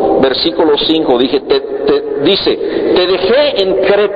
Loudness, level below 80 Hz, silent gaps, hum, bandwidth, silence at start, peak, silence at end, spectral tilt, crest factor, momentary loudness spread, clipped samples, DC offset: -11 LUFS; -42 dBFS; none; none; 5.2 kHz; 0 s; 0 dBFS; 0 s; -7 dB/octave; 12 dB; 3 LU; under 0.1%; under 0.1%